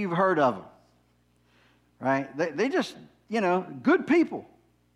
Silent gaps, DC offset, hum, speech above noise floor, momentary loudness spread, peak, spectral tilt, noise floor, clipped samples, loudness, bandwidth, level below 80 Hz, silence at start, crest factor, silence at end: none; under 0.1%; 60 Hz at -60 dBFS; 40 dB; 10 LU; -10 dBFS; -6.5 dB/octave; -66 dBFS; under 0.1%; -26 LUFS; 11.5 kHz; -70 dBFS; 0 s; 18 dB; 0.5 s